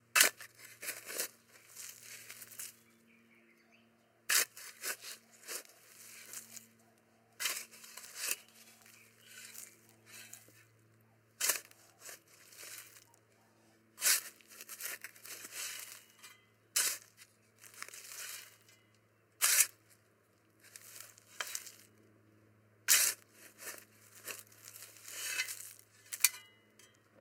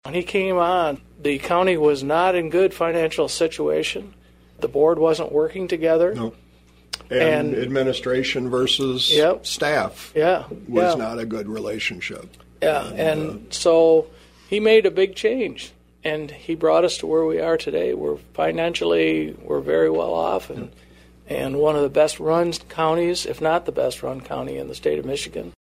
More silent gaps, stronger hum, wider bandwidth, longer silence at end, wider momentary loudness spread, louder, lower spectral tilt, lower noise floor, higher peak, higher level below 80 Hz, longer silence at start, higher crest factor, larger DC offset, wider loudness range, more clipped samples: neither; second, none vs 60 Hz at -50 dBFS; first, 18 kHz vs 15 kHz; first, 0.75 s vs 0.2 s; first, 26 LU vs 12 LU; second, -35 LUFS vs -21 LUFS; second, 2 dB/octave vs -4.5 dB/octave; first, -70 dBFS vs -42 dBFS; about the same, -6 dBFS vs -4 dBFS; second, under -90 dBFS vs -50 dBFS; about the same, 0.15 s vs 0.05 s; first, 36 dB vs 18 dB; neither; first, 9 LU vs 3 LU; neither